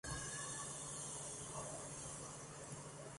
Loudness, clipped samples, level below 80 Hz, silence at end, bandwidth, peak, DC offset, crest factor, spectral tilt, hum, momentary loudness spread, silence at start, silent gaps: -47 LUFS; under 0.1%; -66 dBFS; 0 s; 11.5 kHz; -32 dBFS; under 0.1%; 18 dB; -2.5 dB/octave; none; 6 LU; 0.05 s; none